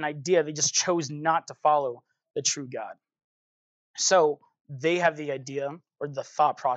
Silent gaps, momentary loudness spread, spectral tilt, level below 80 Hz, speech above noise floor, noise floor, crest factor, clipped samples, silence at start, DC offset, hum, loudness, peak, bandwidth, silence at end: 3.24-3.94 s, 4.61-4.65 s; 15 LU; -2.5 dB/octave; -88 dBFS; over 64 dB; under -90 dBFS; 18 dB; under 0.1%; 0 s; under 0.1%; none; -26 LUFS; -8 dBFS; 9.4 kHz; 0 s